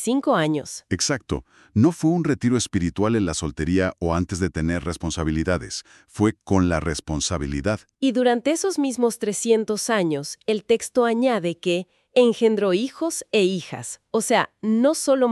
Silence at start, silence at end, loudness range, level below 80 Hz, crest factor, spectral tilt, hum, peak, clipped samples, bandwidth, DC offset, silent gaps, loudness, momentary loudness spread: 0 s; 0 s; 3 LU; -40 dBFS; 18 dB; -5 dB/octave; none; -4 dBFS; under 0.1%; 13.5 kHz; under 0.1%; none; -22 LUFS; 8 LU